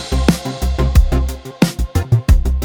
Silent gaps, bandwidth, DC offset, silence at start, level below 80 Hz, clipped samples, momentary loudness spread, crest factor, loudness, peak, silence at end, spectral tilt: none; 18.5 kHz; under 0.1%; 0 s; -16 dBFS; under 0.1%; 6 LU; 14 dB; -17 LUFS; 0 dBFS; 0 s; -6 dB/octave